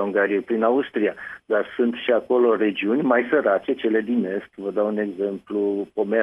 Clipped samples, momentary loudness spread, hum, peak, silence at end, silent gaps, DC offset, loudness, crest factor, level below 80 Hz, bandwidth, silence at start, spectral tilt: under 0.1%; 7 LU; none; -4 dBFS; 0 s; none; under 0.1%; -22 LUFS; 18 dB; -66 dBFS; 5.6 kHz; 0 s; -8 dB/octave